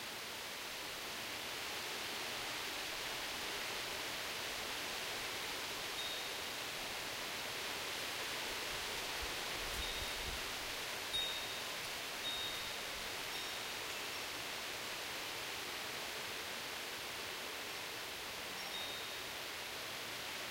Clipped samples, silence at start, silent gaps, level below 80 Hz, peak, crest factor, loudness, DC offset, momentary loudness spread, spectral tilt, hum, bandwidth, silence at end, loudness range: under 0.1%; 0 s; none; -62 dBFS; -28 dBFS; 16 dB; -41 LUFS; under 0.1%; 3 LU; -1 dB/octave; none; 16 kHz; 0 s; 3 LU